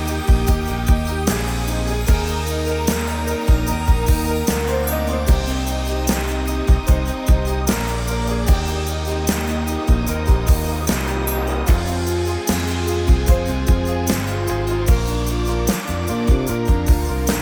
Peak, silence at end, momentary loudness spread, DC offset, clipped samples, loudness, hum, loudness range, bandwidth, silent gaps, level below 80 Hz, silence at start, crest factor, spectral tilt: -2 dBFS; 0 s; 4 LU; under 0.1%; under 0.1%; -20 LUFS; none; 1 LU; over 20 kHz; none; -20 dBFS; 0 s; 16 dB; -5.5 dB/octave